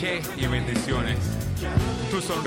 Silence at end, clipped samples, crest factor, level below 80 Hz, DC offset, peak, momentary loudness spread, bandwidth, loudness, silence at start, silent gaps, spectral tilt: 0 s; under 0.1%; 18 dB; -36 dBFS; under 0.1%; -8 dBFS; 2 LU; 17 kHz; -26 LUFS; 0 s; none; -5 dB/octave